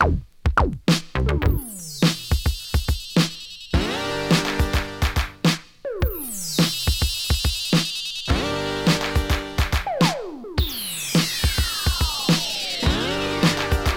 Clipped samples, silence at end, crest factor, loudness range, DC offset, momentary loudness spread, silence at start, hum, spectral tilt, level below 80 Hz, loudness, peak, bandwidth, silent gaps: under 0.1%; 0 s; 18 dB; 1 LU; under 0.1%; 5 LU; 0 s; none; -4.5 dB/octave; -28 dBFS; -22 LUFS; -4 dBFS; 18.5 kHz; none